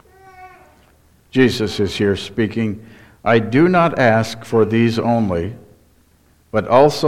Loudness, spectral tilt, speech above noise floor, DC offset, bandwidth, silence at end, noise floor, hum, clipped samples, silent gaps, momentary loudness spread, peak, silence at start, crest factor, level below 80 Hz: -17 LUFS; -6.5 dB/octave; 39 dB; under 0.1%; 14.5 kHz; 0 s; -54 dBFS; none; under 0.1%; none; 10 LU; 0 dBFS; 0.4 s; 18 dB; -48 dBFS